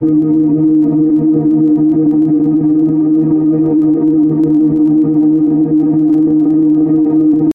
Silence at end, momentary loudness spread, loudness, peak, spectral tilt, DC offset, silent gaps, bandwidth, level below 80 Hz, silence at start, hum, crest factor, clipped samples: 0 s; 1 LU; -11 LUFS; -4 dBFS; -12.5 dB/octave; under 0.1%; none; 1.7 kHz; -48 dBFS; 0 s; none; 6 dB; under 0.1%